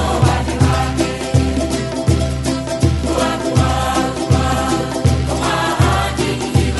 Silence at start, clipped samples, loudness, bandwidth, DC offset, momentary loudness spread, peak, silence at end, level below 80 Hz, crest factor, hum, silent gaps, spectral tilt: 0 s; under 0.1%; -17 LUFS; 12 kHz; under 0.1%; 4 LU; -2 dBFS; 0 s; -24 dBFS; 14 dB; none; none; -5.5 dB/octave